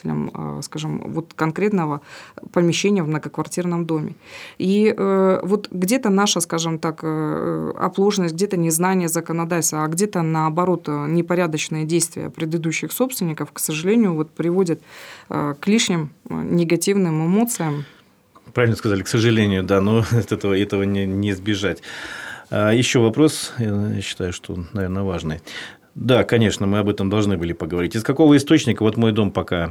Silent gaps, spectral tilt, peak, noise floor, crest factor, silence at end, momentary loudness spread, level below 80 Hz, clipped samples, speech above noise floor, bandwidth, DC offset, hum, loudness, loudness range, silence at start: none; -5.5 dB/octave; -4 dBFS; -52 dBFS; 16 dB; 0 s; 11 LU; -56 dBFS; under 0.1%; 33 dB; 19.5 kHz; under 0.1%; none; -20 LUFS; 3 LU; 0.05 s